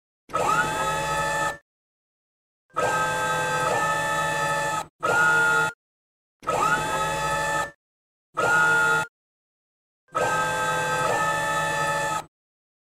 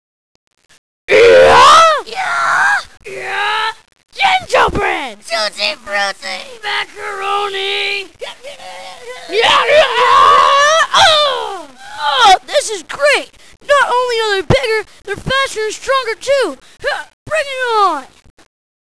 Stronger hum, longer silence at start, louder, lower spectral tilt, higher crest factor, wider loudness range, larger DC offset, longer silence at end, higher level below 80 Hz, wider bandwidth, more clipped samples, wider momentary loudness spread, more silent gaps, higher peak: neither; second, 0.3 s vs 1.1 s; second, -23 LUFS vs -12 LUFS; about the same, -3 dB/octave vs -2 dB/octave; first, 16 dB vs 10 dB; second, 3 LU vs 8 LU; second, 0.1% vs 1%; second, 0.6 s vs 0.85 s; second, -52 dBFS vs -40 dBFS; first, 16 kHz vs 11 kHz; neither; second, 9 LU vs 18 LU; first, 1.62-2.69 s, 4.90-4.99 s, 5.74-6.40 s, 7.75-8.33 s, 9.09-10.08 s vs 17.13-17.26 s; second, -10 dBFS vs -2 dBFS